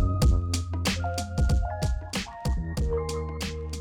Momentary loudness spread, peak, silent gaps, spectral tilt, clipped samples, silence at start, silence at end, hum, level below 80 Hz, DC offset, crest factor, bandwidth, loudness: 8 LU; -12 dBFS; none; -5.5 dB/octave; under 0.1%; 0 s; 0 s; none; -30 dBFS; under 0.1%; 14 dB; 18 kHz; -29 LUFS